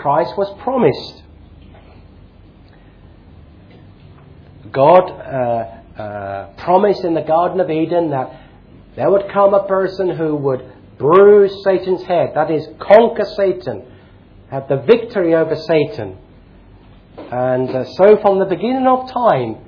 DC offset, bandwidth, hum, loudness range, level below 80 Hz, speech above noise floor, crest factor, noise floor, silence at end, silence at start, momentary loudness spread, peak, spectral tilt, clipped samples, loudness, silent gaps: under 0.1%; 5.4 kHz; none; 6 LU; -48 dBFS; 29 dB; 16 dB; -43 dBFS; 0.1 s; 0 s; 16 LU; 0 dBFS; -8.5 dB/octave; under 0.1%; -15 LUFS; none